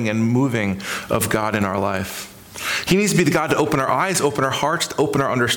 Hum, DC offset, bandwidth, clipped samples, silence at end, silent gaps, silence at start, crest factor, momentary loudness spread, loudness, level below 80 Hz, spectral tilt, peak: none; under 0.1%; 19 kHz; under 0.1%; 0 s; none; 0 s; 14 dB; 8 LU; -20 LUFS; -50 dBFS; -4.5 dB/octave; -6 dBFS